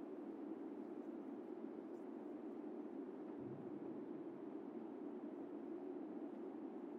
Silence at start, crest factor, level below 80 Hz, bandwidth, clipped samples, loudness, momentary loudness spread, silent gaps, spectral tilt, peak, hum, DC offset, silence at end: 0 s; 14 dB; under -90 dBFS; 6 kHz; under 0.1%; -51 LUFS; 1 LU; none; -8 dB/octave; -36 dBFS; none; under 0.1%; 0 s